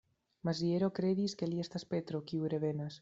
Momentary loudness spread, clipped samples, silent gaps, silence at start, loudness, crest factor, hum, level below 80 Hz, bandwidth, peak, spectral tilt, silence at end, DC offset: 6 LU; under 0.1%; none; 0.45 s; -36 LUFS; 16 dB; none; -74 dBFS; 7.8 kHz; -20 dBFS; -7 dB/octave; 0.05 s; under 0.1%